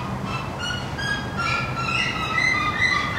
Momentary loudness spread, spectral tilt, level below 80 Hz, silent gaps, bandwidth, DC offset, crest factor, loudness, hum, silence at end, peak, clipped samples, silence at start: 8 LU; -4 dB/octave; -42 dBFS; none; 16 kHz; under 0.1%; 16 dB; -23 LUFS; none; 0 s; -8 dBFS; under 0.1%; 0 s